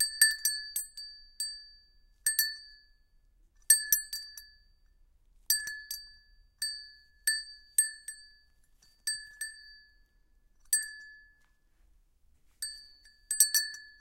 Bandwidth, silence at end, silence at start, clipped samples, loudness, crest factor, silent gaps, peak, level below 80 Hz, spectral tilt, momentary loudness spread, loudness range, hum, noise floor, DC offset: 16.5 kHz; 0.1 s; 0 s; under 0.1%; -30 LUFS; 28 dB; none; -8 dBFS; -66 dBFS; 5.5 dB/octave; 22 LU; 8 LU; none; -67 dBFS; under 0.1%